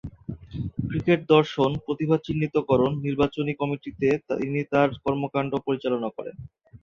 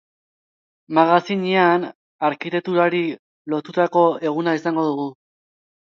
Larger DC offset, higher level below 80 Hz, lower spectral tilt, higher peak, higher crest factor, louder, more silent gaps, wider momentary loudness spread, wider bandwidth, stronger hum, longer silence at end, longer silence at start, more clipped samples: neither; first, -50 dBFS vs -74 dBFS; about the same, -8 dB/octave vs -7 dB/octave; about the same, -4 dBFS vs -2 dBFS; about the same, 20 dB vs 20 dB; second, -25 LUFS vs -20 LUFS; second, none vs 1.95-2.19 s, 3.19-3.45 s; about the same, 13 LU vs 11 LU; about the same, 7.2 kHz vs 7 kHz; neither; second, 0.05 s vs 0.8 s; second, 0.05 s vs 0.9 s; neither